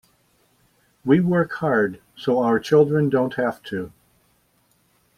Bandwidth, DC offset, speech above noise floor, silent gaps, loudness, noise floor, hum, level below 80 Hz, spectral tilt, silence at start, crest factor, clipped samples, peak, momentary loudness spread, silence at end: 14 kHz; under 0.1%; 44 dB; none; -21 LUFS; -63 dBFS; none; -60 dBFS; -8 dB/octave; 1.05 s; 18 dB; under 0.1%; -4 dBFS; 14 LU; 1.3 s